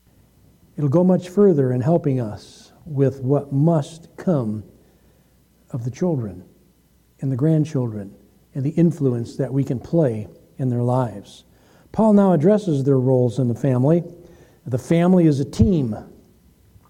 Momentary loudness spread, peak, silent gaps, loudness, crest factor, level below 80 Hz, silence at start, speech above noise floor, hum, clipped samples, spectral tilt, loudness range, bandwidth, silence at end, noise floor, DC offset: 16 LU; -4 dBFS; none; -20 LUFS; 16 dB; -46 dBFS; 0.75 s; 39 dB; none; under 0.1%; -9 dB/octave; 6 LU; 11 kHz; 0.8 s; -57 dBFS; under 0.1%